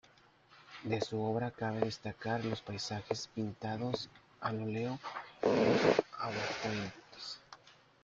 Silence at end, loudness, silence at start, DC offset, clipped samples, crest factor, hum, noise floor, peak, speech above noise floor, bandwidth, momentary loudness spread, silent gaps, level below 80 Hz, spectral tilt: 0.3 s; -36 LUFS; 0.5 s; under 0.1%; under 0.1%; 24 dB; none; -64 dBFS; -14 dBFS; 29 dB; 7.8 kHz; 15 LU; none; -70 dBFS; -5.5 dB/octave